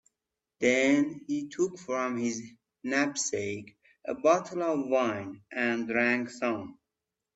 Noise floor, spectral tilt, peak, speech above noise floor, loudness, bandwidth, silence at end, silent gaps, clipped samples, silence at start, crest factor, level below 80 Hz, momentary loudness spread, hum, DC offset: -88 dBFS; -4 dB/octave; -10 dBFS; 59 dB; -29 LUFS; 8.4 kHz; 0.6 s; none; under 0.1%; 0.6 s; 20 dB; -74 dBFS; 13 LU; none; under 0.1%